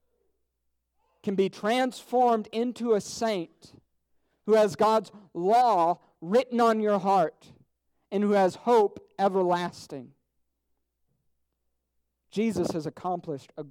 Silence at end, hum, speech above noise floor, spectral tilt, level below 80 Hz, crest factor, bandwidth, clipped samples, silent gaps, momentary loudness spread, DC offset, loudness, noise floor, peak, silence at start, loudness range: 0 s; none; 53 dB; -5.5 dB/octave; -70 dBFS; 16 dB; 16 kHz; under 0.1%; none; 13 LU; under 0.1%; -26 LUFS; -78 dBFS; -12 dBFS; 1.25 s; 10 LU